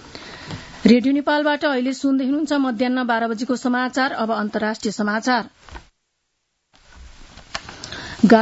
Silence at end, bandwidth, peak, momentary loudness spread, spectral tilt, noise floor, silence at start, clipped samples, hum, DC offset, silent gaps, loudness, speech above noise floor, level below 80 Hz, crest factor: 0 s; 8 kHz; 0 dBFS; 17 LU; -5 dB/octave; -73 dBFS; 0 s; under 0.1%; none; under 0.1%; none; -20 LUFS; 53 dB; -50 dBFS; 20 dB